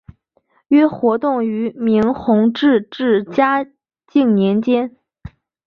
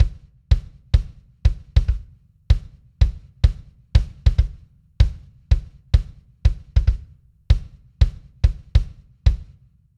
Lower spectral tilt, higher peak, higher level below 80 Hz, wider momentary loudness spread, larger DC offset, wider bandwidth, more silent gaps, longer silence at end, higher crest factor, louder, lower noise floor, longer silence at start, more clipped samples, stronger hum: first, -8.5 dB/octave vs -7 dB/octave; about the same, -2 dBFS vs -2 dBFS; second, -52 dBFS vs -22 dBFS; about the same, 6 LU vs 7 LU; neither; second, 5.8 kHz vs 6.8 kHz; neither; second, 0.4 s vs 0.55 s; about the same, 14 dB vs 18 dB; first, -16 LUFS vs -23 LUFS; first, -61 dBFS vs -51 dBFS; first, 0.7 s vs 0 s; neither; neither